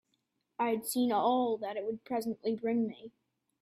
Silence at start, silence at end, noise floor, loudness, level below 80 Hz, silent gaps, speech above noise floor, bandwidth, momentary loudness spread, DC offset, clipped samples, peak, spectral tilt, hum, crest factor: 0.6 s; 0.5 s; -80 dBFS; -33 LUFS; -80 dBFS; none; 48 dB; 15.5 kHz; 9 LU; under 0.1%; under 0.1%; -18 dBFS; -4.5 dB/octave; none; 16 dB